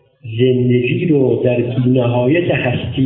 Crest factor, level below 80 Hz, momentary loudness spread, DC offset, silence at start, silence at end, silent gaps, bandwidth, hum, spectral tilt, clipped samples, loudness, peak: 14 dB; -42 dBFS; 3 LU; 0.1%; 0.25 s; 0 s; none; 3.9 kHz; none; -12.5 dB/octave; under 0.1%; -15 LUFS; -2 dBFS